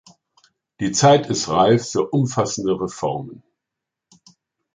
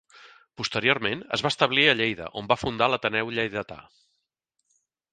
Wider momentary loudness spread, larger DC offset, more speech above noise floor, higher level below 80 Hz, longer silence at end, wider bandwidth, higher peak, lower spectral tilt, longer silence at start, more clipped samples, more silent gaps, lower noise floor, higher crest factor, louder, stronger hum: about the same, 12 LU vs 14 LU; neither; first, 65 dB vs 54 dB; about the same, -56 dBFS vs -58 dBFS; about the same, 1.4 s vs 1.3 s; about the same, 9.6 kHz vs 9.6 kHz; about the same, -2 dBFS vs -2 dBFS; about the same, -5 dB/octave vs -4 dB/octave; first, 0.8 s vs 0.2 s; neither; neither; first, -84 dBFS vs -79 dBFS; second, 18 dB vs 24 dB; first, -19 LUFS vs -24 LUFS; neither